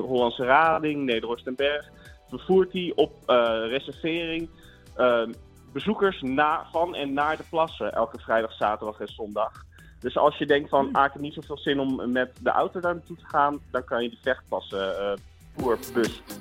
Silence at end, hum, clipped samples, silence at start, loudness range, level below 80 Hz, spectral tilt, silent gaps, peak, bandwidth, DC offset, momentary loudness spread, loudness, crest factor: 0 s; none; under 0.1%; 0 s; 3 LU; -54 dBFS; -5.5 dB/octave; none; -6 dBFS; 16.5 kHz; under 0.1%; 11 LU; -26 LUFS; 20 dB